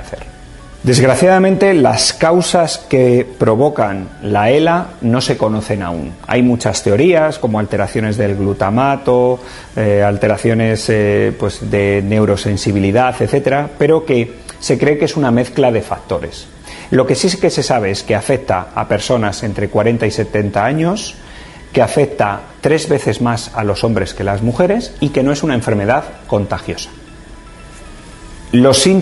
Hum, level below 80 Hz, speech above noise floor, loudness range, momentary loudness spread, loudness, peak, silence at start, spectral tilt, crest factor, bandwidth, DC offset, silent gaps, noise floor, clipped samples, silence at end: none; -38 dBFS; 21 dB; 4 LU; 10 LU; -14 LUFS; 0 dBFS; 0 s; -5.5 dB/octave; 14 dB; 12 kHz; under 0.1%; none; -35 dBFS; under 0.1%; 0 s